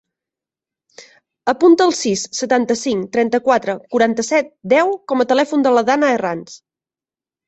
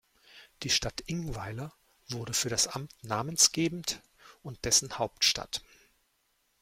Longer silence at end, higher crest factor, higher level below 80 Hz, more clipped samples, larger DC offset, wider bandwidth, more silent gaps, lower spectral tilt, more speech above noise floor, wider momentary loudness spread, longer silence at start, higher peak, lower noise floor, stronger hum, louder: about the same, 0.9 s vs 1 s; second, 16 dB vs 24 dB; second, -62 dBFS vs -54 dBFS; neither; neither; second, 8.4 kHz vs 16.5 kHz; neither; first, -4 dB/octave vs -2 dB/octave; first, over 74 dB vs 43 dB; second, 7 LU vs 17 LU; first, 1 s vs 0.35 s; first, -2 dBFS vs -10 dBFS; first, under -90 dBFS vs -74 dBFS; neither; first, -16 LUFS vs -29 LUFS